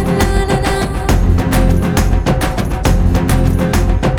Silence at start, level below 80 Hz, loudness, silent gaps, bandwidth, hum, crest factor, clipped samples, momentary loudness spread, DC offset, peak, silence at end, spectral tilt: 0 s; -16 dBFS; -14 LUFS; none; 18.5 kHz; none; 12 dB; under 0.1%; 3 LU; under 0.1%; 0 dBFS; 0 s; -6 dB/octave